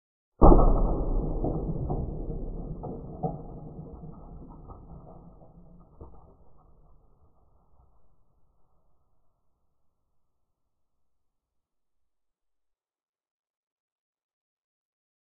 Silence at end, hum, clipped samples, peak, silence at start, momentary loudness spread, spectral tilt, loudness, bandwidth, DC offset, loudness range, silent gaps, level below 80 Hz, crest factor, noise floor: 9.2 s; none; under 0.1%; -2 dBFS; 0.4 s; 27 LU; -3.5 dB/octave; -28 LUFS; 1.5 kHz; under 0.1%; 26 LU; none; -34 dBFS; 28 dB; -83 dBFS